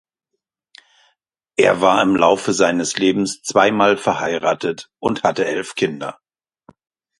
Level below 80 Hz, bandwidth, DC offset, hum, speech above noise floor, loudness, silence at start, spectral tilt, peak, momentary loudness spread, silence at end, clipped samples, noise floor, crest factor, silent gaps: -58 dBFS; 11.5 kHz; under 0.1%; none; 61 dB; -17 LUFS; 1.6 s; -4 dB/octave; 0 dBFS; 9 LU; 1.05 s; under 0.1%; -78 dBFS; 18 dB; none